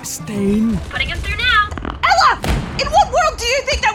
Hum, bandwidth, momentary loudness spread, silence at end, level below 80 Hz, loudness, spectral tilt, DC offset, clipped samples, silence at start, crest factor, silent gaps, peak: none; 18 kHz; 8 LU; 0 s; -28 dBFS; -16 LUFS; -4 dB/octave; under 0.1%; under 0.1%; 0 s; 14 dB; none; -2 dBFS